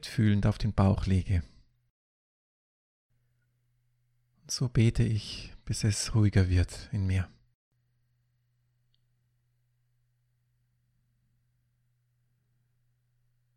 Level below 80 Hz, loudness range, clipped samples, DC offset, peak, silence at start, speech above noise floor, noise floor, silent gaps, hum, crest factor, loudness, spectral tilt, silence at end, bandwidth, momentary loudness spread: -46 dBFS; 10 LU; under 0.1%; under 0.1%; -10 dBFS; 0.05 s; 46 dB; -73 dBFS; 1.90-3.10 s; none; 22 dB; -29 LUFS; -6 dB/octave; 6.3 s; 12 kHz; 10 LU